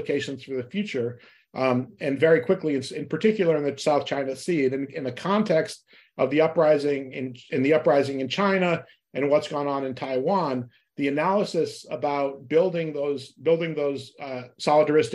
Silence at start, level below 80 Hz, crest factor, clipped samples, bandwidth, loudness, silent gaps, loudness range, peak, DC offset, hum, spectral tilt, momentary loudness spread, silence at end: 0 s; -72 dBFS; 18 dB; under 0.1%; 12 kHz; -25 LUFS; none; 3 LU; -8 dBFS; under 0.1%; none; -6 dB/octave; 12 LU; 0 s